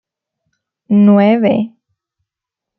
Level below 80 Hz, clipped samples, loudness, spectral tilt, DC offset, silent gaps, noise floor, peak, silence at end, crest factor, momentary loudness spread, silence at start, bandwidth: -62 dBFS; under 0.1%; -11 LUFS; -11 dB/octave; under 0.1%; none; -83 dBFS; -2 dBFS; 1.1 s; 14 dB; 10 LU; 0.9 s; 4.3 kHz